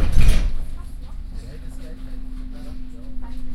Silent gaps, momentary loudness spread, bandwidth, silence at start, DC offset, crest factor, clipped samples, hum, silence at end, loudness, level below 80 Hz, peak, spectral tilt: none; 17 LU; 11 kHz; 0 s; under 0.1%; 16 dB; under 0.1%; none; 0 s; -30 LUFS; -22 dBFS; -2 dBFS; -6 dB/octave